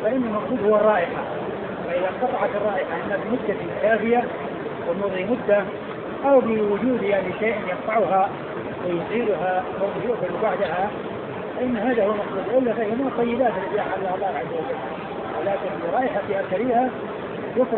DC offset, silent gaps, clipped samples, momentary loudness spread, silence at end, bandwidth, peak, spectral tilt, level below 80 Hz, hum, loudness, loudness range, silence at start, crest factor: under 0.1%; none; under 0.1%; 10 LU; 0 s; 4.4 kHz; -6 dBFS; -10.5 dB/octave; -56 dBFS; none; -23 LUFS; 3 LU; 0 s; 16 dB